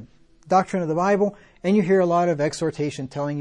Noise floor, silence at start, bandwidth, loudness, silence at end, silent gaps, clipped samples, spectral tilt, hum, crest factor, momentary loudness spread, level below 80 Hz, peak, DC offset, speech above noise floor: -48 dBFS; 0 s; 11 kHz; -22 LUFS; 0 s; none; under 0.1%; -6.5 dB/octave; none; 16 dB; 9 LU; -58 dBFS; -6 dBFS; under 0.1%; 26 dB